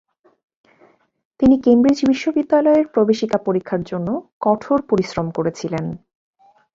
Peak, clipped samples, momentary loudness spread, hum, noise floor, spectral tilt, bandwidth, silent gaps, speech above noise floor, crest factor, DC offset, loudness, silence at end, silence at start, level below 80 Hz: -2 dBFS; under 0.1%; 11 LU; none; -55 dBFS; -7 dB/octave; 7.6 kHz; 4.32-4.41 s; 38 dB; 16 dB; under 0.1%; -18 LUFS; 0.8 s; 1.4 s; -50 dBFS